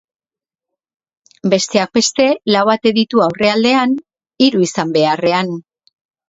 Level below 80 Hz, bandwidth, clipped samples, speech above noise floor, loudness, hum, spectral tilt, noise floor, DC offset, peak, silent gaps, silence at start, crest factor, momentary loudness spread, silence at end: -58 dBFS; 8 kHz; under 0.1%; 76 dB; -14 LUFS; none; -4 dB/octave; -89 dBFS; under 0.1%; 0 dBFS; none; 1.45 s; 16 dB; 6 LU; 0.7 s